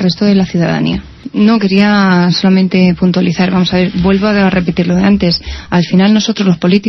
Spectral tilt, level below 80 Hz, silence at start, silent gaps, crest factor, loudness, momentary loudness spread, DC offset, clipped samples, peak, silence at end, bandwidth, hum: -6.5 dB/octave; -34 dBFS; 0 s; none; 10 dB; -11 LUFS; 5 LU; under 0.1%; under 0.1%; 0 dBFS; 0 s; 6.2 kHz; none